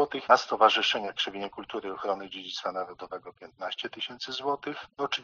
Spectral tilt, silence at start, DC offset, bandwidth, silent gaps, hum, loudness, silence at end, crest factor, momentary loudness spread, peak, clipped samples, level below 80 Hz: 0.5 dB/octave; 0 s; under 0.1%; 7.2 kHz; none; none; -29 LUFS; 0 s; 26 dB; 16 LU; -4 dBFS; under 0.1%; -72 dBFS